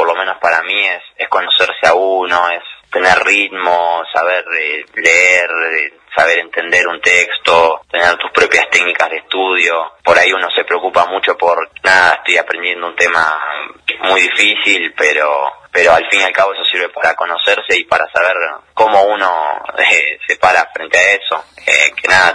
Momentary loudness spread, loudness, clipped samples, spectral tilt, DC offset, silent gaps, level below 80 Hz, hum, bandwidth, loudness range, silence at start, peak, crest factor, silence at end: 7 LU; -11 LUFS; 0.2%; -1 dB/octave; under 0.1%; none; -52 dBFS; none; 11 kHz; 2 LU; 0 s; 0 dBFS; 12 dB; 0 s